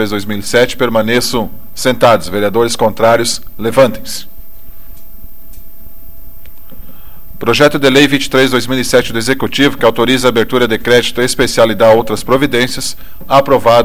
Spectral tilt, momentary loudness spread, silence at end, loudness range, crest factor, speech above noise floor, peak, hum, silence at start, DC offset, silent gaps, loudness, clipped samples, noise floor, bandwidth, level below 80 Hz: -4 dB/octave; 9 LU; 0 s; 8 LU; 12 dB; 24 dB; 0 dBFS; none; 0 s; 9%; none; -11 LUFS; 0.2%; -35 dBFS; 17.5 kHz; -36 dBFS